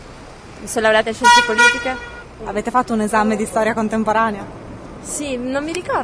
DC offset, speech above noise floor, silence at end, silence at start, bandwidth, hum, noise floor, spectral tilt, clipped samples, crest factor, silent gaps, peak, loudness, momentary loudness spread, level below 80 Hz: under 0.1%; 20 dB; 0 s; 0 s; 11 kHz; none; -37 dBFS; -3 dB/octave; under 0.1%; 18 dB; none; 0 dBFS; -17 LUFS; 22 LU; -44 dBFS